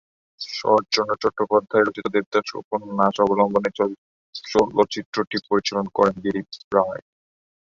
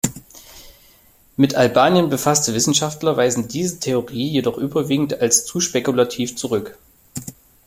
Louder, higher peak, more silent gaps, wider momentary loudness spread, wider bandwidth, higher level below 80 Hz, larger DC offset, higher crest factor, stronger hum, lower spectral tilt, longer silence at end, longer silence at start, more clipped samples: second, -22 LUFS vs -18 LUFS; about the same, -2 dBFS vs -2 dBFS; first, 2.26-2.32 s, 2.64-2.71 s, 3.98-4.33 s, 5.05-5.13 s, 5.27-5.31 s, 6.64-6.71 s vs none; second, 10 LU vs 17 LU; second, 7.6 kHz vs 16.5 kHz; second, -60 dBFS vs -52 dBFS; neither; about the same, 20 dB vs 18 dB; neither; about the same, -5 dB/octave vs -4 dB/octave; first, 0.65 s vs 0.35 s; first, 0.4 s vs 0.05 s; neither